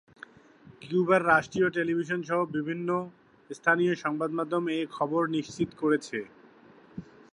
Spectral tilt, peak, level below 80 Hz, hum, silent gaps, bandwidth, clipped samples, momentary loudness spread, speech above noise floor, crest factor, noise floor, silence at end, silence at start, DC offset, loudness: -6 dB/octave; -8 dBFS; -68 dBFS; none; none; 10.5 kHz; under 0.1%; 20 LU; 28 dB; 22 dB; -55 dBFS; 0.3 s; 0.65 s; under 0.1%; -28 LUFS